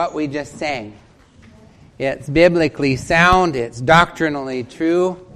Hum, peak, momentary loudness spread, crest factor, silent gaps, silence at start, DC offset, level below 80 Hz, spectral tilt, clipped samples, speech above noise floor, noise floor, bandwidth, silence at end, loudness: none; 0 dBFS; 12 LU; 18 dB; none; 0 s; under 0.1%; -38 dBFS; -5.5 dB/octave; under 0.1%; 30 dB; -47 dBFS; 12.5 kHz; 0.1 s; -17 LUFS